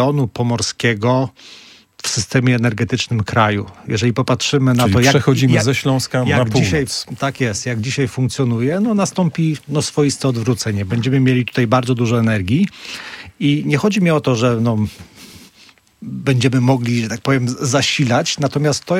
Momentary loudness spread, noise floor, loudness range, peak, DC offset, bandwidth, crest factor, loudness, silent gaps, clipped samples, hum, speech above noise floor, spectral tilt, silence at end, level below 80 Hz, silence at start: 7 LU; -48 dBFS; 3 LU; 0 dBFS; under 0.1%; 15.5 kHz; 16 dB; -16 LUFS; none; under 0.1%; none; 32 dB; -5.5 dB/octave; 0 s; -48 dBFS; 0 s